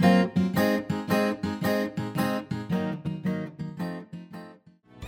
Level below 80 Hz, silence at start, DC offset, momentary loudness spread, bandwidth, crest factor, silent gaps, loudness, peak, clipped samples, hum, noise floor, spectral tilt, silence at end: -60 dBFS; 0 s; under 0.1%; 14 LU; 17.5 kHz; 20 dB; none; -28 LUFS; -8 dBFS; under 0.1%; none; -53 dBFS; -6.5 dB/octave; 0 s